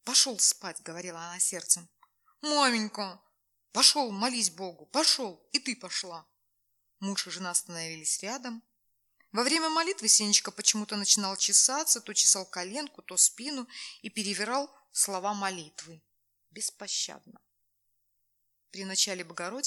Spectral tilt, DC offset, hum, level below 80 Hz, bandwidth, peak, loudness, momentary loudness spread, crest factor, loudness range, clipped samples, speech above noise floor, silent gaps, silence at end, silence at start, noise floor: -0.5 dB/octave; under 0.1%; none; under -90 dBFS; 19 kHz; -6 dBFS; -27 LUFS; 18 LU; 24 dB; 10 LU; under 0.1%; 47 dB; none; 0 s; 0.05 s; -77 dBFS